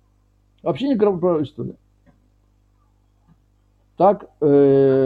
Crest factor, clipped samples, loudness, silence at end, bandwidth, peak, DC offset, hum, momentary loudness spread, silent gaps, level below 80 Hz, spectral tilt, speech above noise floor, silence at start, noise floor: 16 dB; under 0.1%; -18 LUFS; 0 s; 4.9 kHz; -4 dBFS; under 0.1%; 50 Hz at -55 dBFS; 15 LU; none; -58 dBFS; -10 dB/octave; 42 dB; 0.65 s; -59 dBFS